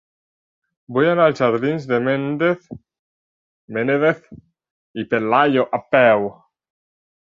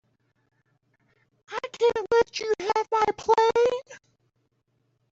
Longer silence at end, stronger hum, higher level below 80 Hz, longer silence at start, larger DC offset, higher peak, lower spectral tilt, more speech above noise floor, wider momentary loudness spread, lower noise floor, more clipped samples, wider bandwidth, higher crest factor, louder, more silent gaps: about the same, 1.05 s vs 1.15 s; neither; about the same, -62 dBFS vs -62 dBFS; second, 0.9 s vs 1.5 s; neither; first, -2 dBFS vs -10 dBFS; first, -7.5 dB/octave vs -3 dB/octave; first, over 72 dB vs 49 dB; about the same, 13 LU vs 14 LU; first, under -90 dBFS vs -73 dBFS; neither; about the same, 7.4 kHz vs 7.8 kHz; about the same, 18 dB vs 18 dB; first, -18 LUFS vs -24 LUFS; first, 2.99-3.68 s, 4.71-4.94 s vs none